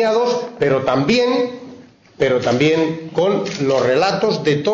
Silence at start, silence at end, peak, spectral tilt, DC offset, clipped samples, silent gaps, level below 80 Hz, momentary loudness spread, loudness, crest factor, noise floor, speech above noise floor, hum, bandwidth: 0 s; 0 s; -6 dBFS; -5.5 dB/octave; under 0.1%; under 0.1%; none; -54 dBFS; 5 LU; -17 LUFS; 12 dB; -41 dBFS; 24 dB; none; 7.8 kHz